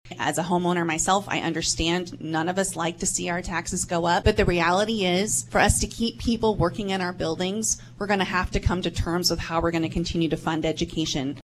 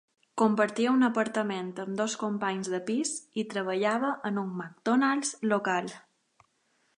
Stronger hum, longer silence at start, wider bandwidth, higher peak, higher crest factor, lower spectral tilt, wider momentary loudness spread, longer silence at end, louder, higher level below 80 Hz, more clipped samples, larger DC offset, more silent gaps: neither; second, 0.05 s vs 0.35 s; first, 14 kHz vs 11 kHz; first, -4 dBFS vs -10 dBFS; about the same, 20 dB vs 18 dB; about the same, -4 dB/octave vs -4.5 dB/octave; second, 6 LU vs 9 LU; second, 0 s vs 1 s; first, -24 LUFS vs -29 LUFS; first, -38 dBFS vs -80 dBFS; neither; neither; neither